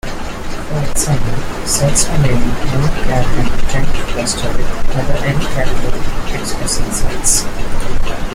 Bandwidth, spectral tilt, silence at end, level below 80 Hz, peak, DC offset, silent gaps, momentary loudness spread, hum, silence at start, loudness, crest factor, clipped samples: 14.5 kHz; -4 dB/octave; 0 s; -18 dBFS; 0 dBFS; under 0.1%; none; 9 LU; none; 0.05 s; -17 LUFS; 10 dB; under 0.1%